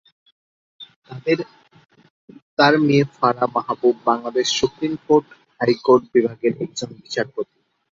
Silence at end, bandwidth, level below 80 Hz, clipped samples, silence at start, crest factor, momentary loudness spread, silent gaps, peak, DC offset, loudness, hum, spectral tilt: 0.5 s; 7.6 kHz; -60 dBFS; under 0.1%; 0.8 s; 18 dB; 13 LU; 0.96-1.02 s, 2.10-2.28 s, 2.42-2.57 s; -2 dBFS; under 0.1%; -20 LUFS; none; -5 dB/octave